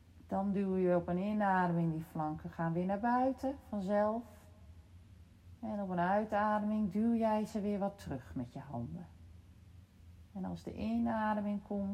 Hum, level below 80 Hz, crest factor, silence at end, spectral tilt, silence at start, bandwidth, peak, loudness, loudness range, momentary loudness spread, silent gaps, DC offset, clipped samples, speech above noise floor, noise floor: none; -62 dBFS; 14 dB; 0 s; -8.5 dB/octave; 0.15 s; 13.5 kHz; -22 dBFS; -36 LUFS; 7 LU; 12 LU; none; under 0.1%; under 0.1%; 23 dB; -58 dBFS